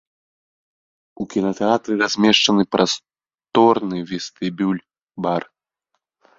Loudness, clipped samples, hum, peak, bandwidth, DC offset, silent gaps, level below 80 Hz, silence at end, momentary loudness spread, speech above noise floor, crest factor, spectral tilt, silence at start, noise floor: -19 LUFS; under 0.1%; none; -2 dBFS; 7.8 kHz; under 0.1%; none; -60 dBFS; 1 s; 12 LU; 57 dB; 20 dB; -4 dB/octave; 1.2 s; -76 dBFS